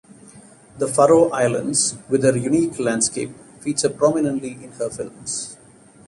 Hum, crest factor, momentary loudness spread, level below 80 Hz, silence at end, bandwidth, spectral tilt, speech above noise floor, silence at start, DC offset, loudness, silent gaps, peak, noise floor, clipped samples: none; 18 dB; 15 LU; -58 dBFS; 0.55 s; 11.5 kHz; -4 dB/octave; 29 dB; 0.25 s; under 0.1%; -20 LUFS; none; -4 dBFS; -48 dBFS; under 0.1%